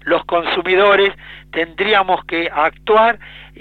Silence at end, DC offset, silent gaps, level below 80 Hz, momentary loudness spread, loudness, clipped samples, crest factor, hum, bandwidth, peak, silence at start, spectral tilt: 0.15 s; under 0.1%; none; -46 dBFS; 10 LU; -15 LUFS; under 0.1%; 14 dB; 50 Hz at -45 dBFS; 6.2 kHz; -2 dBFS; 0.05 s; -5.5 dB/octave